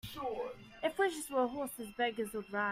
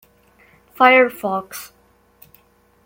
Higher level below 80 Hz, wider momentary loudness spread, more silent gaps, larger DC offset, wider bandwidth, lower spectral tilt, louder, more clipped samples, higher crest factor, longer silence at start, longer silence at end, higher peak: about the same, -66 dBFS vs -64 dBFS; second, 8 LU vs 22 LU; neither; neither; about the same, 16 kHz vs 17 kHz; about the same, -3.5 dB/octave vs -3.5 dB/octave; second, -37 LUFS vs -15 LUFS; neither; about the same, 18 dB vs 20 dB; second, 0.05 s vs 0.8 s; second, 0 s vs 1.2 s; second, -20 dBFS vs -2 dBFS